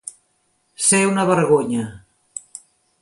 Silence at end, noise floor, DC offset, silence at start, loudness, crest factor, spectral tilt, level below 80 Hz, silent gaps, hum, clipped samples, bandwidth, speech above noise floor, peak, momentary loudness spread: 0.6 s; -66 dBFS; under 0.1%; 0.05 s; -17 LUFS; 18 dB; -4 dB/octave; -60 dBFS; none; none; under 0.1%; 11.5 kHz; 49 dB; -4 dBFS; 21 LU